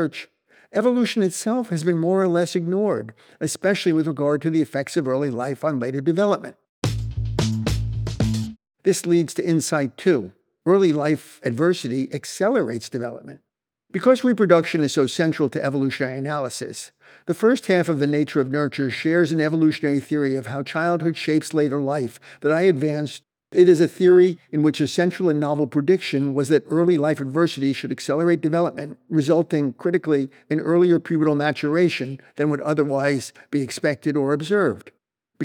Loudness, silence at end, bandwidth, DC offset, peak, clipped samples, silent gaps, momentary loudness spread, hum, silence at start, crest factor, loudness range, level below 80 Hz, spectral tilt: -21 LUFS; 0 s; 16.5 kHz; under 0.1%; -2 dBFS; under 0.1%; 6.69-6.82 s; 10 LU; none; 0 s; 18 dB; 4 LU; -46 dBFS; -6 dB/octave